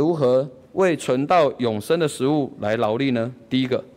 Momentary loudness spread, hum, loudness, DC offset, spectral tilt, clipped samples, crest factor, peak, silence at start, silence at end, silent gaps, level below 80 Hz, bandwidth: 6 LU; none; -21 LUFS; under 0.1%; -6 dB/octave; under 0.1%; 12 dB; -8 dBFS; 0 s; 0.1 s; none; -62 dBFS; 16 kHz